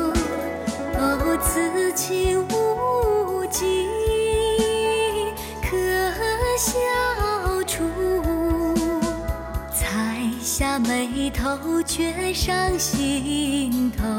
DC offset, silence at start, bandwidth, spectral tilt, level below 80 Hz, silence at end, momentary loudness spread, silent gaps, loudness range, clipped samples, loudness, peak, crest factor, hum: under 0.1%; 0 s; 17.5 kHz; -4 dB/octave; -34 dBFS; 0 s; 5 LU; none; 2 LU; under 0.1%; -23 LUFS; -8 dBFS; 14 dB; none